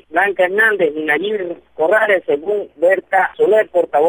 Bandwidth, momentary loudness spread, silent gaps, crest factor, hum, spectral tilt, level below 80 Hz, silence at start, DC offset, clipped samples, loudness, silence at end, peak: 19 kHz; 7 LU; none; 14 dB; none; -5 dB/octave; -62 dBFS; 0.1 s; under 0.1%; under 0.1%; -15 LUFS; 0 s; -2 dBFS